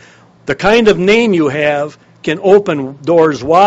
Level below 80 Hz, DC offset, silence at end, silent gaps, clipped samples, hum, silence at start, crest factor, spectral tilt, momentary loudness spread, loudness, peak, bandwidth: -42 dBFS; under 0.1%; 0 s; none; 0.4%; none; 0.45 s; 12 dB; -5.5 dB/octave; 12 LU; -12 LUFS; 0 dBFS; 8 kHz